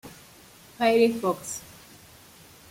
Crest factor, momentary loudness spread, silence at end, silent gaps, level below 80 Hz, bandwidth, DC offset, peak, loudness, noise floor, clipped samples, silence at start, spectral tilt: 20 dB; 26 LU; 1.1 s; none; -64 dBFS; 16.5 kHz; under 0.1%; -8 dBFS; -25 LUFS; -51 dBFS; under 0.1%; 0.05 s; -4 dB/octave